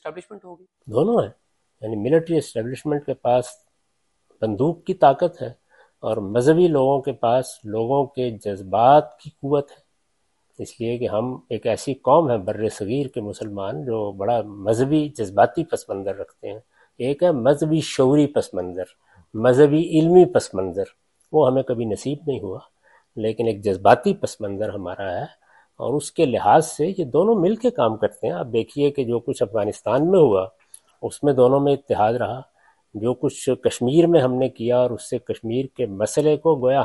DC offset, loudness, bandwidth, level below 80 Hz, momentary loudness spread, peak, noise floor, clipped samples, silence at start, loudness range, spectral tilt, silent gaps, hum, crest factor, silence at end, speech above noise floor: under 0.1%; -21 LUFS; 11.5 kHz; -58 dBFS; 15 LU; 0 dBFS; -72 dBFS; under 0.1%; 0.05 s; 5 LU; -6.5 dB/octave; none; none; 20 dB; 0 s; 52 dB